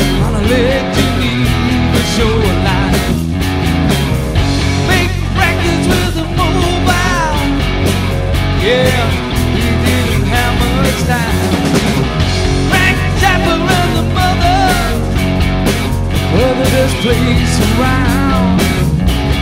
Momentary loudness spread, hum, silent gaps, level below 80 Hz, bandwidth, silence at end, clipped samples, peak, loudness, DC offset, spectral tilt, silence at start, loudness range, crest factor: 3 LU; none; none; -20 dBFS; 16.5 kHz; 0 s; under 0.1%; 0 dBFS; -12 LUFS; under 0.1%; -5.5 dB/octave; 0 s; 1 LU; 12 dB